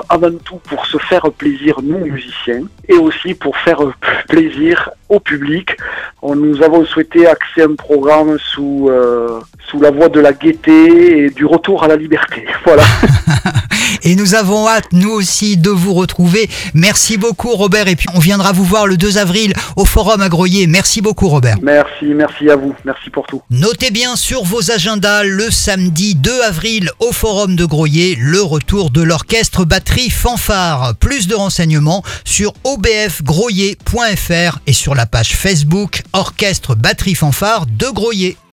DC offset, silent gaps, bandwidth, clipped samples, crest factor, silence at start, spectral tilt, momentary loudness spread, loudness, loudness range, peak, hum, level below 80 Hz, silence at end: under 0.1%; none; 18 kHz; 0.2%; 10 dB; 0 s; -4.5 dB/octave; 8 LU; -11 LUFS; 4 LU; 0 dBFS; none; -26 dBFS; 0.2 s